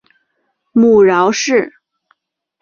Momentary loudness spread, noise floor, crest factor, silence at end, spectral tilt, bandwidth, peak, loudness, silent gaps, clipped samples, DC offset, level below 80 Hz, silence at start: 9 LU; -67 dBFS; 14 dB; 0.9 s; -4.5 dB/octave; 7.4 kHz; 0 dBFS; -12 LUFS; none; under 0.1%; under 0.1%; -56 dBFS; 0.75 s